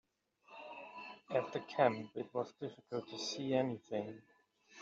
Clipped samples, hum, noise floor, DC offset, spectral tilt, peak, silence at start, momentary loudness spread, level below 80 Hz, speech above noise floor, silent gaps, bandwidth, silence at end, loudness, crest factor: under 0.1%; none; -68 dBFS; under 0.1%; -4 dB/octave; -18 dBFS; 0.5 s; 17 LU; -84 dBFS; 30 dB; none; 7.6 kHz; 0 s; -39 LUFS; 22 dB